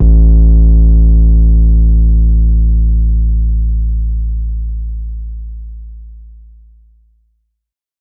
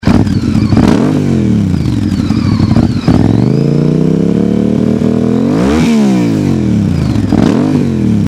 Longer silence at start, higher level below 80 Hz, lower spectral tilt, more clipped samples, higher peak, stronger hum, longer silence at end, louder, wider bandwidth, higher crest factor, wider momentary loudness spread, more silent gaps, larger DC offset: about the same, 0 s vs 0.05 s; first, -10 dBFS vs -26 dBFS; first, -17.5 dB/octave vs -8 dB/octave; second, under 0.1% vs 0.4%; about the same, 0 dBFS vs 0 dBFS; neither; first, 1.75 s vs 0 s; about the same, -12 LUFS vs -10 LUFS; second, 0.8 kHz vs 12.5 kHz; about the same, 10 dB vs 10 dB; first, 18 LU vs 3 LU; neither; neither